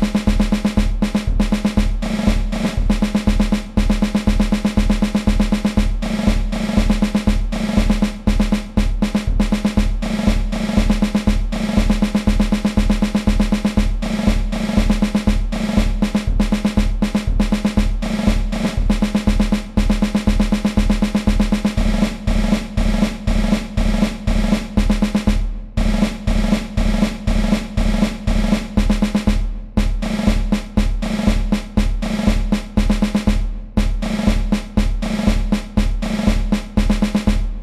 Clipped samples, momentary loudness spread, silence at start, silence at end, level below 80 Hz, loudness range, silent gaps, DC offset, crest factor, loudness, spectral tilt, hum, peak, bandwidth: under 0.1%; 3 LU; 0 s; 0 s; -20 dBFS; 2 LU; none; 0.2%; 14 dB; -19 LUFS; -6 dB/octave; none; -2 dBFS; 13 kHz